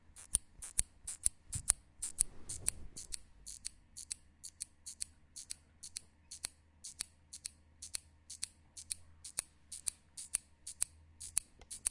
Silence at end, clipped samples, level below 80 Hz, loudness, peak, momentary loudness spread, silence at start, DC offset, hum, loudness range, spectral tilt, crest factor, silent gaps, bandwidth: 0 s; under 0.1%; -58 dBFS; -41 LUFS; -4 dBFS; 15 LU; 0.1 s; under 0.1%; none; 10 LU; 0 dB/octave; 38 dB; none; 11.5 kHz